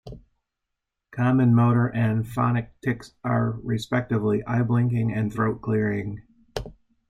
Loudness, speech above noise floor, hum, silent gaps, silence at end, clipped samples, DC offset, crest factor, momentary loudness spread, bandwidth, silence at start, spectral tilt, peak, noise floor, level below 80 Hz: -24 LUFS; 60 dB; none; none; 0.4 s; under 0.1%; under 0.1%; 16 dB; 17 LU; 9.6 kHz; 0.05 s; -8.5 dB/octave; -8 dBFS; -83 dBFS; -50 dBFS